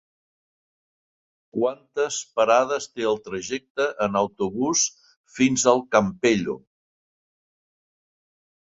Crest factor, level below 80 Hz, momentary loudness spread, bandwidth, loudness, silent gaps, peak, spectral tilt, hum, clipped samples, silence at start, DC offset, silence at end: 22 dB; -62 dBFS; 11 LU; 8.2 kHz; -23 LUFS; 3.70-3.75 s, 5.16-5.24 s; -2 dBFS; -3.5 dB/octave; none; under 0.1%; 1.55 s; under 0.1%; 2.1 s